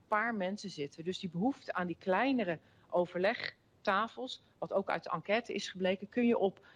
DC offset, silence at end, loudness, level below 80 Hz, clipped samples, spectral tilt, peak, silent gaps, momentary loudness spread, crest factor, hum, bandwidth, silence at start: under 0.1%; 0.25 s; -35 LUFS; -78 dBFS; under 0.1%; -5.5 dB/octave; -18 dBFS; none; 10 LU; 18 dB; none; 10 kHz; 0.1 s